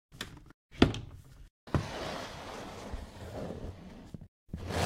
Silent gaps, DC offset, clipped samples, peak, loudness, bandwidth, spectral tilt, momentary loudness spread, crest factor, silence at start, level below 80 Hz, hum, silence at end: 0.54-0.69 s, 1.50-1.67 s, 4.28-4.46 s; under 0.1%; under 0.1%; -6 dBFS; -37 LUFS; 16 kHz; -5.5 dB/octave; 24 LU; 30 dB; 0.1 s; -48 dBFS; none; 0 s